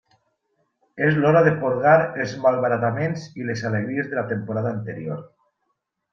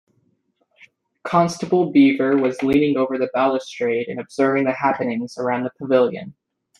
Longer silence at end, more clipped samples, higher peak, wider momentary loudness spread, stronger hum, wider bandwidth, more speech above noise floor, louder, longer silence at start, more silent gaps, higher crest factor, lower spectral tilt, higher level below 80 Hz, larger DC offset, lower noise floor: first, 0.85 s vs 0.5 s; neither; about the same, -2 dBFS vs -2 dBFS; first, 13 LU vs 9 LU; neither; second, 7 kHz vs 11 kHz; first, 54 dB vs 47 dB; about the same, -21 LUFS vs -19 LUFS; second, 0.95 s vs 1.25 s; neither; about the same, 20 dB vs 18 dB; about the same, -7.5 dB/octave vs -6.5 dB/octave; about the same, -62 dBFS vs -58 dBFS; neither; first, -75 dBFS vs -66 dBFS